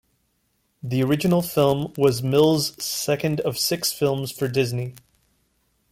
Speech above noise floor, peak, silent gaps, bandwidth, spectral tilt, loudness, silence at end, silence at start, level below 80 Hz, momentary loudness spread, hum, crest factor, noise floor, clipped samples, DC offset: 48 dB; -6 dBFS; none; 17 kHz; -5 dB/octave; -22 LUFS; 1 s; 0.85 s; -58 dBFS; 7 LU; none; 18 dB; -69 dBFS; under 0.1%; under 0.1%